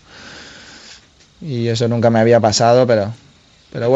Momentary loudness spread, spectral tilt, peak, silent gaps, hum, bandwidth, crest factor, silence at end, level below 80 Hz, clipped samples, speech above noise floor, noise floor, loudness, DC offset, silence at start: 25 LU; -5.5 dB/octave; 0 dBFS; none; none; 8.2 kHz; 16 dB; 0 s; -54 dBFS; under 0.1%; 34 dB; -48 dBFS; -14 LUFS; under 0.1%; 0.15 s